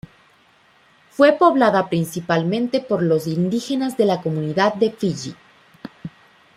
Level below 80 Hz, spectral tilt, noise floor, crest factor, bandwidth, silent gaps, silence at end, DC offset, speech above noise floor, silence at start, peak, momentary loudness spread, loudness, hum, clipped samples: -62 dBFS; -6.5 dB/octave; -55 dBFS; 18 dB; 16 kHz; none; 0.5 s; under 0.1%; 37 dB; 1.2 s; -2 dBFS; 22 LU; -19 LUFS; none; under 0.1%